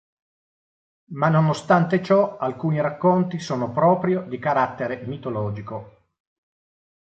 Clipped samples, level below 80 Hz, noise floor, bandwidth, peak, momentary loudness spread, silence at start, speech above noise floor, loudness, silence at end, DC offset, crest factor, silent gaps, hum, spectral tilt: under 0.1%; -60 dBFS; under -90 dBFS; 8.4 kHz; -4 dBFS; 11 LU; 1.1 s; over 69 dB; -22 LUFS; 1.3 s; under 0.1%; 18 dB; none; none; -7.5 dB/octave